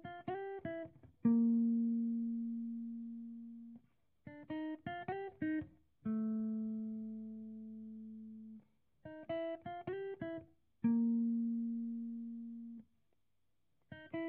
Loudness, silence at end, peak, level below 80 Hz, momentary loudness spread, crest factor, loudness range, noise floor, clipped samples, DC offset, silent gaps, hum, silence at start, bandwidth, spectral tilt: -40 LUFS; 0 s; -22 dBFS; -78 dBFS; 20 LU; 18 dB; 9 LU; -86 dBFS; under 0.1%; under 0.1%; none; none; 0.05 s; 3.4 kHz; -7 dB/octave